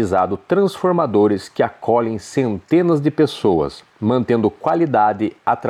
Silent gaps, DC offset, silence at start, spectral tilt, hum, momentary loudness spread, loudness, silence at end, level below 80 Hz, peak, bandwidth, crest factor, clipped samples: none; under 0.1%; 0 s; -7.5 dB/octave; none; 5 LU; -18 LUFS; 0 s; -52 dBFS; -4 dBFS; 12.5 kHz; 14 dB; under 0.1%